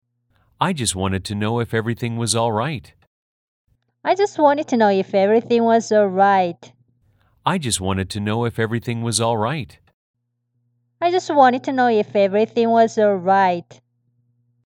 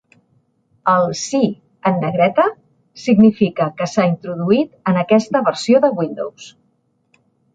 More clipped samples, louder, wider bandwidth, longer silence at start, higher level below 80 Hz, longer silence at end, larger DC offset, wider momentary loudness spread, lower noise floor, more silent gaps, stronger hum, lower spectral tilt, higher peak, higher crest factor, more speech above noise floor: neither; about the same, -19 LUFS vs -17 LUFS; first, 17 kHz vs 9 kHz; second, 0.6 s vs 0.85 s; about the same, -58 dBFS vs -58 dBFS; about the same, 1.05 s vs 1.05 s; neither; about the same, 8 LU vs 9 LU; first, -71 dBFS vs -63 dBFS; first, 3.07-3.65 s, 9.94-10.14 s vs none; neither; about the same, -5 dB/octave vs -6 dB/octave; about the same, -2 dBFS vs -2 dBFS; about the same, 18 dB vs 16 dB; first, 53 dB vs 48 dB